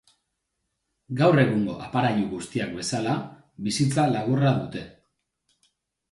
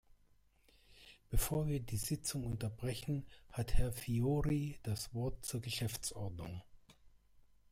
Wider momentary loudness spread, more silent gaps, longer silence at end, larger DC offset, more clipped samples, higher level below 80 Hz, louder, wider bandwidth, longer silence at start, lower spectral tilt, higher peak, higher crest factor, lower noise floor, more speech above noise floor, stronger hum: first, 15 LU vs 11 LU; neither; first, 1.2 s vs 0.65 s; neither; neither; second, -60 dBFS vs -46 dBFS; first, -24 LUFS vs -40 LUFS; second, 11.5 kHz vs 16 kHz; first, 1.1 s vs 0.9 s; about the same, -6 dB/octave vs -5 dB/octave; first, -6 dBFS vs -18 dBFS; about the same, 20 dB vs 20 dB; first, -79 dBFS vs -70 dBFS; first, 55 dB vs 33 dB; neither